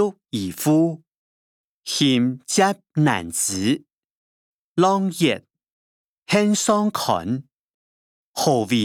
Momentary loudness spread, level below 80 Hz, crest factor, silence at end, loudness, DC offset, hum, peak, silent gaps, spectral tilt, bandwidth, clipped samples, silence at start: 10 LU; -66 dBFS; 18 dB; 0 s; -21 LUFS; under 0.1%; none; -4 dBFS; 1.14-1.83 s, 3.93-4.76 s, 5.70-6.22 s, 7.54-8.34 s; -4.5 dB/octave; 19 kHz; under 0.1%; 0 s